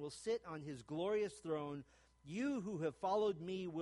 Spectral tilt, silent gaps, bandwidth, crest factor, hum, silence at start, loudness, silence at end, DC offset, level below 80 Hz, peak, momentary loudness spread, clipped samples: -6 dB/octave; none; 11.5 kHz; 14 dB; none; 0 s; -42 LUFS; 0 s; under 0.1%; -74 dBFS; -28 dBFS; 11 LU; under 0.1%